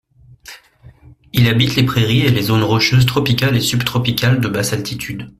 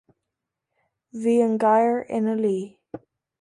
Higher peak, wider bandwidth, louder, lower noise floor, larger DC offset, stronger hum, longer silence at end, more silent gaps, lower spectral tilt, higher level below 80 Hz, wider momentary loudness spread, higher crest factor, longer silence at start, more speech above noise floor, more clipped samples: first, -2 dBFS vs -8 dBFS; first, 15.5 kHz vs 11 kHz; first, -15 LUFS vs -22 LUFS; second, -44 dBFS vs -84 dBFS; neither; neither; second, 0.1 s vs 0.45 s; neither; second, -5 dB/octave vs -7 dB/octave; first, -42 dBFS vs -72 dBFS; second, 7 LU vs 23 LU; about the same, 14 dB vs 16 dB; second, 0.5 s vs 1.15 s; second, 30 dB vs 62 dB; neither